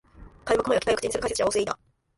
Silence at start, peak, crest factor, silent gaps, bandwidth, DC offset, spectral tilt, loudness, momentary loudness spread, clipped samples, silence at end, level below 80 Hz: 0.15 s; -10 dBFS; 18 dB; none; 11.5 kHz; under 0.1%; -3 dB/octave; -25 LUFS; 10 LU; under 0.1%; 0.4 s; -50 dBFS